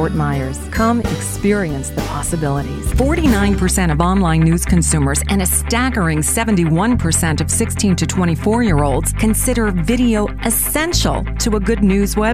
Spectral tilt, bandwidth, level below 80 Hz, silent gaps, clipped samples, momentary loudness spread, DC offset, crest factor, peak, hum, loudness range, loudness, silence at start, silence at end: -5 dB/octave; 16 kHz; -24 dBFS; none; under 0.1%; 5 LU; 0.9%; 16 dB; 0 dBFS; none; 2 LU; -16 LUFS; 0 s; 0 s